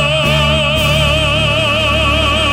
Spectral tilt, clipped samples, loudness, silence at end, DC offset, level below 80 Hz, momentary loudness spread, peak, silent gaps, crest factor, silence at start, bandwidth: -4.5 dB/octave; under 0.1%; -12 LUFS; 0 s; under 0.1%; -22 dBFS; 1 LU; 0 dBFS; none; 12 dB; 0 s; 16.5 kHz